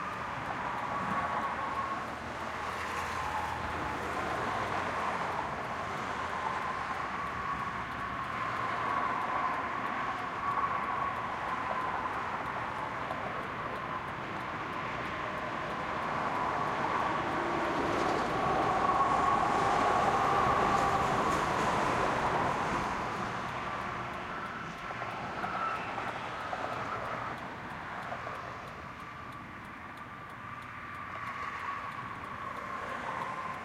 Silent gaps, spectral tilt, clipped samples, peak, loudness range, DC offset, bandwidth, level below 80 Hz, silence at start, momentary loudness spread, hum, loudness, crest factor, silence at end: none; -5 dB/octave; under 0.1%; -16 dBFS; 11 LU; under 0.1%; 16 kHz; -56 dBFS; 0 s; 12 LU; none; -33 LUFS; 18 dB; 0 s